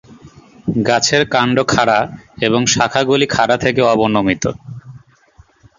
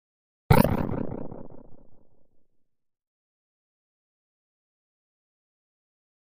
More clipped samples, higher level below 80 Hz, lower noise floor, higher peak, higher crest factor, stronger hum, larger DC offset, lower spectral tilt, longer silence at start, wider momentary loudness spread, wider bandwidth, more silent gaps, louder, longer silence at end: neither; about the same, -46 dBFS vs -42 dBFS; second, -49 dBFS vs -68 dBFS; first, 0 dBFS vs -4 dBFS; second, 16 dB vs 28 dB; neither; neither; second, -4 dB/octave vs -7.5 dB/octave; second, 0.1 s vs 0.5 s; second, 11 LU vs 21 LU; second, 7.8 kHz vs 15.5 kHz; neither; first, -14 LUFS vs -24 LUFS; second, 0.8 s vs 3.2 s